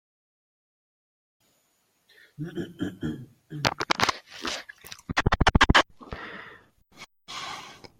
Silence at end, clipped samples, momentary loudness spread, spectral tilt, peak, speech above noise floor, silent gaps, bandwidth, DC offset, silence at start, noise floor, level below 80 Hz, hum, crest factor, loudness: 0.25 s; under 0.1%; 22 LU; -4 dB/octave; 0 dBFS; 38 dB; none; 16.5 kHz; under 0.1%; 2.4 s; -70 dBFS; -38 dBFS; none; 28 dB; -26 LUFS